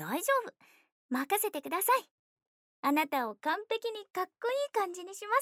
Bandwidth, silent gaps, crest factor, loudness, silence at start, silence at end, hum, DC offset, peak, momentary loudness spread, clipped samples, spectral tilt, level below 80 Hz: over 20 kHz; 0.92-1.09 s, 2.11-2.37 s, 2.47-2.83 s; 18 dB; -32 LUFS; 0 s; 0 s; none; under 0.1%; -16 dBFS; 8 LU; under 0.1%; -2.5 dB/octave; under -90 dBFS